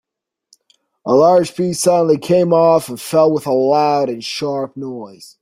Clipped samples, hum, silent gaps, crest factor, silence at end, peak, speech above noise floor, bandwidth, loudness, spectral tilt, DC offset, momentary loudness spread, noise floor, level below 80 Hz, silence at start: under 0.1%; none; none; 14 dB; 0.15 s; -2 dBFS; 47 dB; 16 kHz; -15 LUFS; -5.5 dB/octave; under 0.1%; 15 LU; -61 dBFS; -60 dBFS; 1.05 s